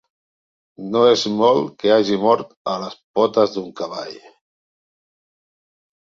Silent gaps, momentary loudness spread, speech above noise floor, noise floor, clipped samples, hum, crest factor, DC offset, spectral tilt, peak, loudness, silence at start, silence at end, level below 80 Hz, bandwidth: 2.57-2.65 s, 3.04-3.14 s; 13 LU; over 72 dB; under -90 dBFS; under 0.1%; none; 20 dB; under 0.1%; -5 dB/octave; -2 dBFS; -18 LUFS; 0.8 s; 1.95 s; -64 dBFS; 7.6 kHz